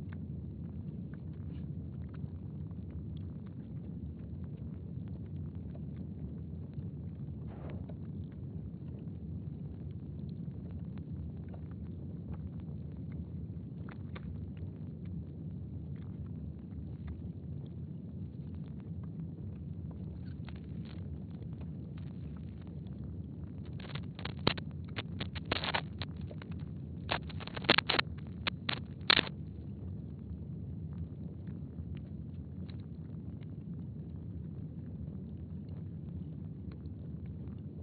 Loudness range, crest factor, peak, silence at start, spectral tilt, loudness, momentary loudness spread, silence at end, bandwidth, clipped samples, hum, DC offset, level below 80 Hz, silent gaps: 10 LU; 34 dB; -8 dBFS; 0 s; -4 dB/octave; -41 LUFS; 9 LU; 0 s; 4.8 kHz; under 0.1%; none; under 0.1%; -52 dBFS; none